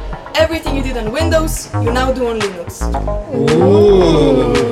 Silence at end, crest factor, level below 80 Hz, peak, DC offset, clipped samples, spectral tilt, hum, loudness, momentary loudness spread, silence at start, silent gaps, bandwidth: 0 s; 12 dB; -24 dBFS; 0 dBFS; under 0.1%; under 0.1%; -6 dB/octave; none; -14 LUFS; 11 LU; 0 s; none; 15.5 kHz